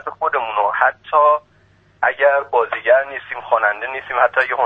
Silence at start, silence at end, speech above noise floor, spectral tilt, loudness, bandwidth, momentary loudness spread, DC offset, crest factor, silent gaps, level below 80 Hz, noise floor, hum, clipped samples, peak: 0.05 s; 0 s; 37 dB; -4.5 dB/octave; -17 LUFS; 5.2 kHz; 7 LU; under 0.1%; 18 dB; none; -62 dBFS; -54 dBFS; none; under 0.1%; 0 dBFS